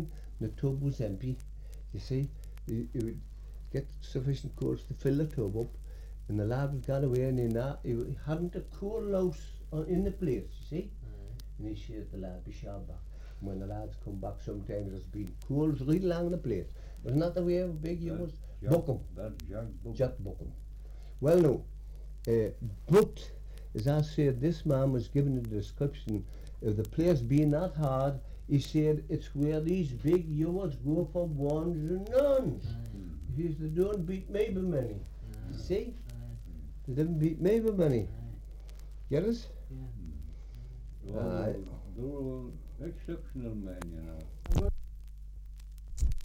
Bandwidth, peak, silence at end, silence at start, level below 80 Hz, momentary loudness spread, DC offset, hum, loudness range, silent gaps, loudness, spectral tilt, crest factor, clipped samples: 16.5 kHz; -12 dBFS; 0 s; 0 s; -42 dBFS; 17 LU; under 0.1%; none; 9 LU; none; -33 LUFS; -8.5 dB/octave; 20 dB; under 0.1%